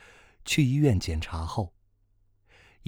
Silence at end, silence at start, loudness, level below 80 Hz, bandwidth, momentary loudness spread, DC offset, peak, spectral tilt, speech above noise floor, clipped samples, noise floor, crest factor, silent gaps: 1.2 s; 0.45 s; -27 LUFS; -46 dBFS; 18.5 kHz; 13 LU; under 0.1%; -10 dBFS; -5.5 dB/octave; 40 dB; under 0.1%; -66 dBFS; 20 dB; none